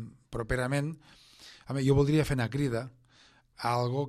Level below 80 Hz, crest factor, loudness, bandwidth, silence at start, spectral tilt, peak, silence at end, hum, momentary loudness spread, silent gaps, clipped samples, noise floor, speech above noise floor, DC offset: -48 dBFS; 16 dB; -30 LUFS; 13.5 kHz; 0 s; -7 dB/octave; -14 dBFS; 0 s; none; 21 LU; none; under 0.1%; -62 dBFS; 33 dB; under 0.1%